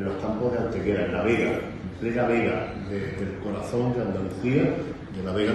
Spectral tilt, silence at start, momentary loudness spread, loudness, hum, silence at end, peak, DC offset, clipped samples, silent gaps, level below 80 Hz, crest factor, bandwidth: -7.5 dB/octave; 0 s; 8 LU; -27 LUFS; none; 0 s; -8 dBFS; under 0.1%; under 0.1%; none; -48 dBFS; 18 dB; 12 kHz